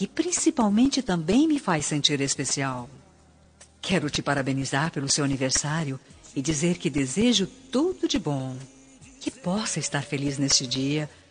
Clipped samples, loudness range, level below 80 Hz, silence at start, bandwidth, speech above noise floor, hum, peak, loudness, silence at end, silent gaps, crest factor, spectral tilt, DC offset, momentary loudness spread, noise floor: under 0.1%; 3 LU; -52 dBFS; 0 s; 10 kHz; 31 dB; none; -6 dBFS; -25 LUFS; 0.2 s; none; 20 dB; -4 dB/octave; under 0.1%; 11 LU; -56 dBFS